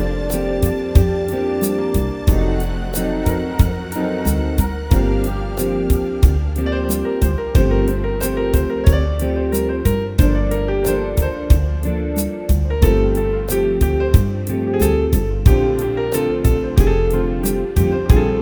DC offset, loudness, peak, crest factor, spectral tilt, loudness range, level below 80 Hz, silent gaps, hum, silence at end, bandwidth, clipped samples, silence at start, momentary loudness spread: under 0.1%; -18 LUFS; 0 dBFS; 16 dB; -7 dB/octave; 2 LU; -20 dBFS; none; none; 0 s; over 20 kHz; under 0.1%; 0 s; 5 LU